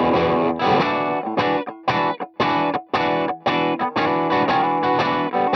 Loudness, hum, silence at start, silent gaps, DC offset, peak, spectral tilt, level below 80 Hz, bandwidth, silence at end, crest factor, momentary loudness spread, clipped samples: -20 LUFS; none; 0 s; none; under 0.1%; -6 dBFS; -6.5 dB/octave; -58 dBFS; 6.6 kHz; 0 s; 14 dB; 4 LU; under 0.1%